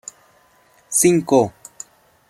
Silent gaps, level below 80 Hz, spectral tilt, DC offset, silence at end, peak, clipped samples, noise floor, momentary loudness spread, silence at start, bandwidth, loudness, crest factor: none; -60 dBFS; -4.5 dB/octave; under 0.1%; 0.8 s; -2 dBFS; under 0.1%; -55 dBFS; 23 LU; 0.9 s; 16 kHz; -17 LUFS; 20 dB